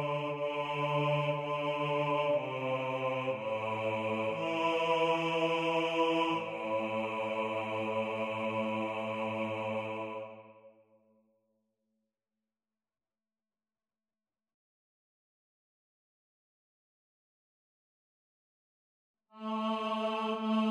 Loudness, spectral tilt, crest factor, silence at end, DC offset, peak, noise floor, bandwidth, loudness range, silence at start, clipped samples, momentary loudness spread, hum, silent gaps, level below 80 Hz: -33 LUFS; -6 dB/octave; 18 dB; 0 s; under 0.1%; -18 dBFS; under -90 dBFS; 12 kHz; 11 LU; 0 s; under 0.1%; 6 LU; none; 14.54-19.14 s; -80 dBFS